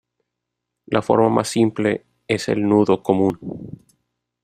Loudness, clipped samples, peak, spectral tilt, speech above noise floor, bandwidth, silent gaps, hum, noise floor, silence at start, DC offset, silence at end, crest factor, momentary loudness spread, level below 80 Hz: -19 LUFS; under 0.1%; -2 dBFS; -6 dB/octave; 62 dB; 14 kHz; none; none; -80 dBFS; 0.9 s; under 0.1%; 0.7 s; 18 dB; 15 LU; -56 dBFS